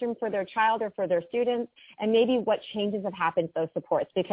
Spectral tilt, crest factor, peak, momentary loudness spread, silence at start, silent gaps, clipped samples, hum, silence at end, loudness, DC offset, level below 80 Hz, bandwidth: -9.5 dB/octave; 16 dB; -12 dBFS; 7 LU; 0 s; none; under 0.1%; none; 0 s; -27 LUFS; under 0.1%; -70 dBFS; 4 kHz